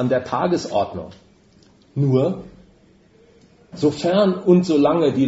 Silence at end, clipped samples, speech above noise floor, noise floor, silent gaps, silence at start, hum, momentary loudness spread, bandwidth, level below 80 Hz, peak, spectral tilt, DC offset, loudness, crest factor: 0 s; under 0.1%; 35 dB; -53 dBFS; none; 0 s; none; 15 LU; 8 kHz; -56 dBFS; -2 dBFS; -7.5 dB/octave; under 0.1%; -19 LUFS; 18 dB